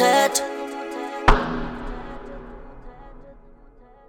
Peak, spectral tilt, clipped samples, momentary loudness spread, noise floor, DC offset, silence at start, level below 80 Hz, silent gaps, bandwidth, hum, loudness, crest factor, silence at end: 0 dBFS; -3.5 dB/octave; under 0.1%; 25 LU; -49 dBFS; under 0.1%; 0 s; -30 dBFS; none; 19 kHz; none; -23 LUFS; 24 dB; 0.55 s